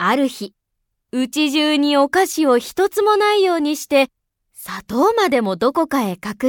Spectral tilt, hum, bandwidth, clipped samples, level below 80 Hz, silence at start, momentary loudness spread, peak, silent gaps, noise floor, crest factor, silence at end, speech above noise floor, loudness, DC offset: -3.5 dB/octave; none; 19.5 kHz; under 0.1%; -58 dBFS; 0 s; 11 LU; -2 dBFS; none; -74 dBFS; 16 dB; 0 s; 57 dB; -17 LUFS; under 0.1%